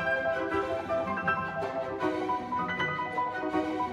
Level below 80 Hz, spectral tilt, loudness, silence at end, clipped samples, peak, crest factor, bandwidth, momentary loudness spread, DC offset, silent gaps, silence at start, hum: -58 dBFS; -6 dB/octave; -31 LUFS; 0 s; under 0.1%; -14 dBFS; 16 dB; 12 kHz; 3 LU; under 0.1%; none; 0 s; none